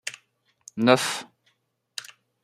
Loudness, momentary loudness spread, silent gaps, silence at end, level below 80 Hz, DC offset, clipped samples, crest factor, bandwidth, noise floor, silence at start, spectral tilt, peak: -23 LUFS; 19 LU; none; 0.4 s; -72 dBFS; under 0.1%; under 0.1%; 26 dB; 15 kHz; -70 dBFS; 0.05 s; -4 dB/octave; -2 dBFS